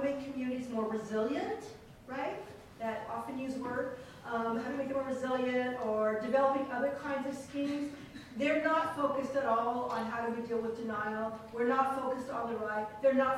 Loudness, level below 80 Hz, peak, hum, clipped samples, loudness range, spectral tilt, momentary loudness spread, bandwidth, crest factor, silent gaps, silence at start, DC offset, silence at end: -34 LUFS; -66 dBFS; -18 dBFS; none; under 0.1%; 5 LU; -5.5 dB/octave; 10 LU; 15 kHz; 16 dB; none; 0 s; under 0.1%; 0 s